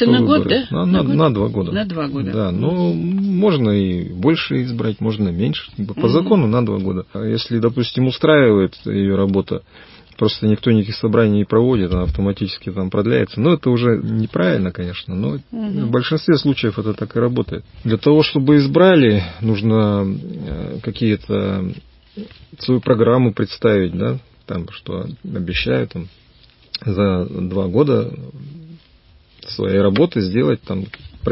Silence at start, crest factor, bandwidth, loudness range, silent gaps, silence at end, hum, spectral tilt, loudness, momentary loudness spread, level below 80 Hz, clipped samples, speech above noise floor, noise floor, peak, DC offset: 0 s; 16 dB; 5.8 kHz; 6 LU; none; 0 s; none; -11.5 dB/octave; -17 LUFS; 13 LU; -38 dBFS; under 0.1%; 33 dB; -50 dBFS; 0 dBFS; under 0.1%